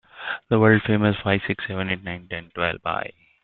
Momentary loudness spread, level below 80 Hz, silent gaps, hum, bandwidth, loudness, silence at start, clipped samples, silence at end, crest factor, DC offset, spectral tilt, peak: 14 LU; -54 dBFS; none; none; 4.3 kHz; -23 LUFS; 0.15 s; under 0.1%; 0.35 s; 20 dB; under 0.1%; -11 dB/octave; -2 dBFS